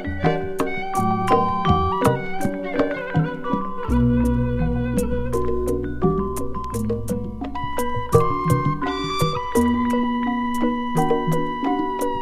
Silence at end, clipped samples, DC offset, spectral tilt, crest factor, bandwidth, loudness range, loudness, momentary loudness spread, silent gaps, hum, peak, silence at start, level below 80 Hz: 0 s; under 0.1%; under 0.1%; -6.5 dB/octave; 20 dB; 16 kHz; 2 LU; -22 LUFS; 7 LU; none; none; 0 dBFS; 0 s; -34 dBFS